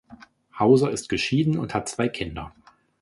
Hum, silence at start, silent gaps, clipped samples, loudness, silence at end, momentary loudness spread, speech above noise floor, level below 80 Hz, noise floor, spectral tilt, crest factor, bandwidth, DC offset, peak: none; 0.1 s; none; under 0.1%; -23 LUFS; 0.55 s; 14 LU; 27 dB; -50 dBFS; -50 dBFS; -5.5 dB/octave; 20 dB; 11.5 kHz; under 0.1%; -4 dBFS